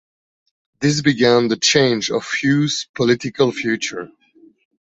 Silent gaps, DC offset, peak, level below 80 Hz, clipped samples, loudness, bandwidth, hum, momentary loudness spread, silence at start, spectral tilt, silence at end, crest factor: 2.89-2.94 s; under 0.1%; -2 dBFS; -56 dBFS; under 0.1%; -17 LUFS; 8.2 kHz; none; 8 LU; 0.8 s; -4 dB/octave; 0.8 s; 18 dB